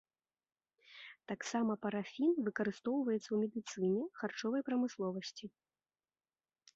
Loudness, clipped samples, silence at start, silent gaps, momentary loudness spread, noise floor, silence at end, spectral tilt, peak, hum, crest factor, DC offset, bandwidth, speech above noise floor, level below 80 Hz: -38 LUFS; under 0.1%; 0.9 s; none; 17 LU; under -90 dBFS; 1.3 s; -5 dB/octave; -24 dBFS; none; 16 dB; under 0.1%; 7.6 kHz; over 53 dB; -84 dBFS